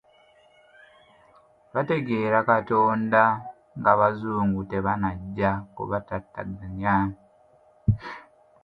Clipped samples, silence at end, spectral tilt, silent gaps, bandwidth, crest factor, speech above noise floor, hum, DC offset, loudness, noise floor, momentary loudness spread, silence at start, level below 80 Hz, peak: under 0.1%; 0.4 s; -9.5 dB/octave; none; 5.2 kHz; 22 dB; 34 dB; none; under 0.1%; -25 LUFS; -58 dBFS; 14 LU; 1.75 s; -48 dBFS; -4 dBFS